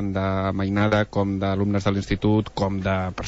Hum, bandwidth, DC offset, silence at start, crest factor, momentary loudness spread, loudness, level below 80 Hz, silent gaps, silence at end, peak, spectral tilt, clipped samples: none; 8 kHz; under 0.1%; 0 s; 14 dB; 4 LU; -23 LUFS; -42 dBFS; none; 0 s; -8 dBFS; -7.5 dB/octave; under 0.1%